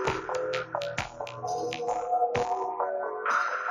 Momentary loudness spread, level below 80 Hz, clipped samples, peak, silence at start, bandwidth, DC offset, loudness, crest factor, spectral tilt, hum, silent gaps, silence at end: 7 LU; -58 dBFS; under 0.1%; -10 dBFS; 0 s; 12.5 kHz; under 0.1%; -30 LUFS; 20 dB; -4 dB/octave; none; none; 0 s